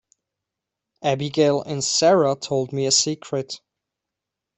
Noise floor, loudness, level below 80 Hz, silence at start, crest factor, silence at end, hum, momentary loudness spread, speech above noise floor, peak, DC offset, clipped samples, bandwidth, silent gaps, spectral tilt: -85 dBFS; -20 LUFS; -64 dBFS; 1 s; 18 dB; 1 s; none; 11 LU; 64 dB; -4 dBFS; under 0.1%; under 0.1%; 8.6 kHz; none; -3.5 dB/octave